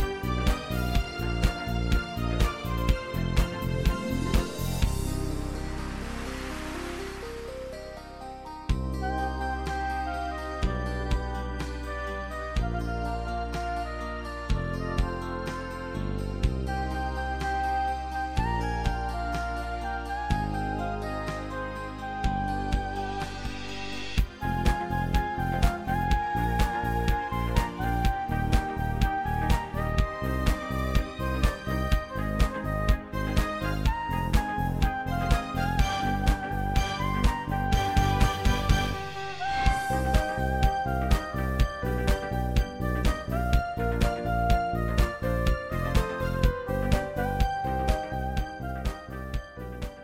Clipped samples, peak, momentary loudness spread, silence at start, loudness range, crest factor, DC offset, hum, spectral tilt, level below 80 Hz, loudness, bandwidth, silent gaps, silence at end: under 0.1%; -8 dBFS; 8 LU; 0 s; 5 LU; 20 dB; under 0.1%; none; -6 dB/octave; -30 dBFS; -29 LUFS; 16.5 kHz; none; 0 s